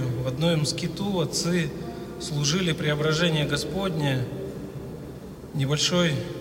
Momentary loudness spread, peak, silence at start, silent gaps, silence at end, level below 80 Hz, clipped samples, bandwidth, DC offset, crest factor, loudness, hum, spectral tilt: 14 LU; -10 dBFS; 0 s; none; 0 s; -48 dBFS; under 0.1%; 16 kHz; under 0.1%; 16 dB; -25 LUFS; none; -4.5 dB/octave